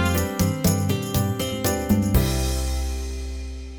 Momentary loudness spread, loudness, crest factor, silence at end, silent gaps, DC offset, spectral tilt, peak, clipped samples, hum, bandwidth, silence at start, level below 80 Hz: 10 LU; -23 LUFS; 16 dB; 0 s; none; under 0.1%; -5 dB/octave; -6 dBFS; under 0.1%; none; over 20 kHz; 0 s; -30 dBFS